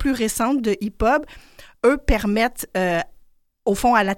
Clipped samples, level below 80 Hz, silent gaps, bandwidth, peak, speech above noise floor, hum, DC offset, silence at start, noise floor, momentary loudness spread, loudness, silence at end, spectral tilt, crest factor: under 0.1%; -32 dBFS; none; 17 kHz; -4 dBFS; 33 dB; none; under 0.1%; 0 s; -53 dBFS; 7 LU; -21 LUFS; 0 s; -4.5 dB/octave; 18 dB